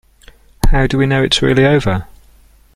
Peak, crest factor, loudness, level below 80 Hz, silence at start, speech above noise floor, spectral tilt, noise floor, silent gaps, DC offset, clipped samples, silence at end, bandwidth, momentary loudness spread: 0 dBFS; 14 dB; -14 LUFS; -20 dBFS; 0.65 s; 34 dB; -5.5 dB/octave; -46 dBFS; none; under 0.1%; under 0.1%; 0.7 s; 14.5 kHz; 9 LU